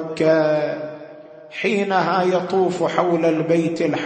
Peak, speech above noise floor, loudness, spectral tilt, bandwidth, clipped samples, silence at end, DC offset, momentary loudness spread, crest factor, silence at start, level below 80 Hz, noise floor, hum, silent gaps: -2 dBFS; 21 dB; -19 LUFS; -6.5 dB/octave; 8.8 kHz; under 0.1%; 0 s; under 0.1%; 14 LU; 18 dB; 0 s; -66 dBFS; -40 dBFS; none; none